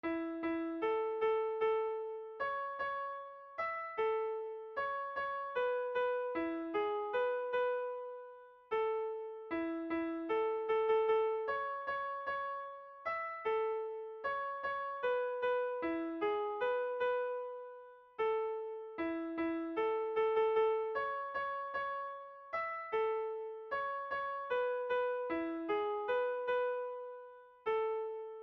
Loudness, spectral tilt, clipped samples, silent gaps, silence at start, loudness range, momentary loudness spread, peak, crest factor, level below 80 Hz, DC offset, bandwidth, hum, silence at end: -37 LUFS; -6 dB/octave; under 0.1%; none; 0.05 s; 3 LU; 9 LU; -24 dBFS; 14 dB; -74 dBFS; under 0.1%; 5.6 kHz; none; 0 s